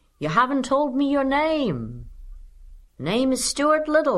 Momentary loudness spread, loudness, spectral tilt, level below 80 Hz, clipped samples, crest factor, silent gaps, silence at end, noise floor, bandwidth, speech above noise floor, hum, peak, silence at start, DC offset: 12 LU; -22 LUFS; -4.5 dB/octave; -46 dBFS; under 0.1%; 16 dB; none; 0 s; -45 dBFS; 13 kHz; 24 dB; none; -6 dBFS; 0.2 s; under 0.1%